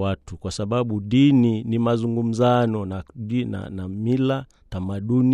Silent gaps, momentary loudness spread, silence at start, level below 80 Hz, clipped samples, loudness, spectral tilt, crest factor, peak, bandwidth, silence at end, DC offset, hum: none; 14 LU; 0 s; -50 dBFS; under 0.1%; -22 LUFS; -7.5 dB/octave; 14 dB; -6 dBFS; 10 kHz; 0 s; under 0.1%; none